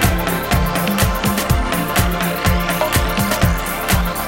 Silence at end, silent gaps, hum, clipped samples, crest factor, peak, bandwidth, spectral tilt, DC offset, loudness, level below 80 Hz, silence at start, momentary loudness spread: 0 s; none; none; under 0.1%; 14 dB; -2 dBFS; 17 kHz; -4.5 dB/octave; under 0.1%; -17 LUFS; -24 dBFS; 0 s; 1 LU